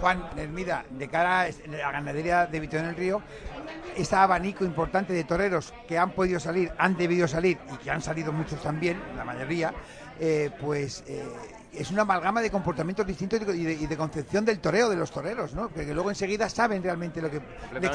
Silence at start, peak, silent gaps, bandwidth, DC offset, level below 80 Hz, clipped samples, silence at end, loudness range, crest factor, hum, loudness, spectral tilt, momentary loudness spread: 0 s; -6 dBFS; none; 10.5 kHz; under 0.1%; -48 dBFS; under 0.1%; 0 s; 4 LU; 22 dB; none; -28 LUFS; -5.5 dB/octave; 11 LU